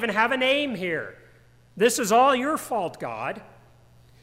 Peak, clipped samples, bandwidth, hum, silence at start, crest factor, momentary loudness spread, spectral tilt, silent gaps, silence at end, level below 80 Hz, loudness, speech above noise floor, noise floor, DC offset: -8 dBFS; under 0.1%; 16 kHz; none; 0 s; 18 dB; 13 LU; -3 dB/octave; none; 0.75 s; -64 dBFS; -23 LUFS; 31 dB; -55 dBFS; under 0.1%